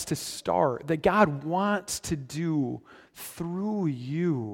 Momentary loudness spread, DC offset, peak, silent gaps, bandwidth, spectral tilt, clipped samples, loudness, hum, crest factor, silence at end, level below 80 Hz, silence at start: 10 LU; under 0.1%; -6 dBFS; none; 17 kHz; -5.5 dB/octave; under 0.1%; -28 LUFS; none; 22 dB; 0 s; -56 dBFS; 0 s